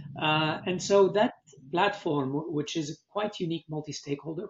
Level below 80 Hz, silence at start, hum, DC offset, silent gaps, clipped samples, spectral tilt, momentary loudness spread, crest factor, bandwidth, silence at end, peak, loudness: -68 dBFS; 0 s; none; under 0.1%; none; under 0.1%; -4 dB/octave; 12 LU; 20 dB; 8 kHz; 0 s; -10 dBFS; -29 LUFS